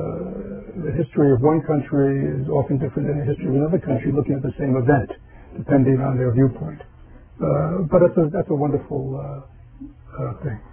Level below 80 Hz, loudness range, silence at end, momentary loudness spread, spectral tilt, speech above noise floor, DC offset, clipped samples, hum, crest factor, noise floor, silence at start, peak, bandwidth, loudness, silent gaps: -42 dBFS; 2 LU; 0 s; 16 LU; -13.5 dB/octave; 21 dB; under 0.1%; under 0.1%; none; 18 dB; -40 dBFS; 0 s; -4 dBFS; 3.4 kHz; -21 LUFS; none